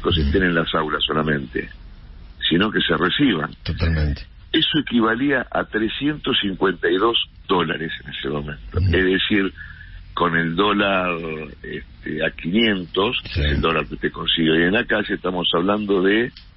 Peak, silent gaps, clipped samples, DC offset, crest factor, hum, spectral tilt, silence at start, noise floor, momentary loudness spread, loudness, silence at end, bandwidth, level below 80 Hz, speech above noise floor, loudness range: -6 dBFS; none; under 0.1%; under 0.1%; 14 dB; none; -10.5 dB/octave; 0 s; -40 dBFS; 11 LU; -20 LUFS; 0.1 s; 5.8 kHz; -34 dBFS; 19 dB; 2 LU